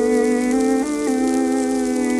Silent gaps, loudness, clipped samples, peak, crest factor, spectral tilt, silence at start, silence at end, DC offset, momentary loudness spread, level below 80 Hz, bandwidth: none; -19 LUFS; under 0.1%; -6 dBFS; 12 dB; -4 dB/octave; 0 s; 0 s; under 0.1%; 2 LU; -48 dBFS; 13 kHz